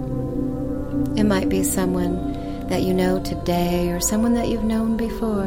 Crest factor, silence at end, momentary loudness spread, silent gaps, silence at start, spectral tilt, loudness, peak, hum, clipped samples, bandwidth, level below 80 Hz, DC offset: 14 dB; 0 s; 6 LU; none; 0 s; -5.5 dB/octave; -22 LUFS; -8 dBFS; none; under 0.1%; 16.5 kHz; -34 dBFS; under 0.1%